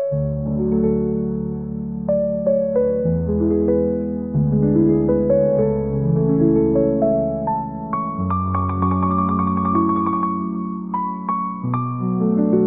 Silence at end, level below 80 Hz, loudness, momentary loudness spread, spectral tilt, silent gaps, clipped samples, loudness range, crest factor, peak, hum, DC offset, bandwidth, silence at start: 0 s; -40 dBFS; -20 LUFS; 8 LU; -15 dB/octave; none; under 0.1%; 3 LU; 14 dB; -6 dBFS; none; 0.2%; 3.6 kHz; 0 s